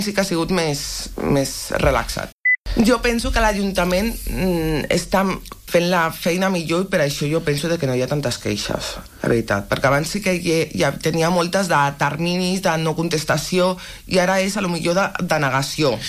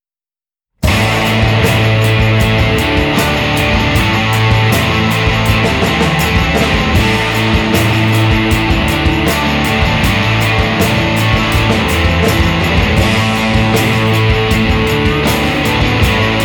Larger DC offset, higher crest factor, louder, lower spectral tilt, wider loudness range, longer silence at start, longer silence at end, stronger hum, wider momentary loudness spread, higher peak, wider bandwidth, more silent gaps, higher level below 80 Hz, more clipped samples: neither; about the same, 16 dB vs 12 dB; second, -20 LUFS vs -11 LUFS; about the same, -4.5 dB/octave vs -5 dB/octave; about the same, 2 LU vs 0 LU; second, 0 s vs 0.8 s; about the same, 0 s vs 0 s; neither; first, 5 LU vs 1 LU; second, -4 dBFS vs 0 dBFS; second, 15.5 kHz vs over 20 kHz; first, 2.32-2.44 s, 2.58-2.64 s vs none; second, -34 dBFS vs -22 dBFS; neither